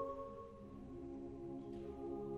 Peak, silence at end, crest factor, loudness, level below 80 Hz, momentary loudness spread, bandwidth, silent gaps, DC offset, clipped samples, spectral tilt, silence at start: -32 dBFS; 0 s; 16 dB; -50 LUFS; -62 dBFS; 7 LU; 9.4 kHz; none; under 0.1%; under 0.1%; -9 dB/octave; 0 s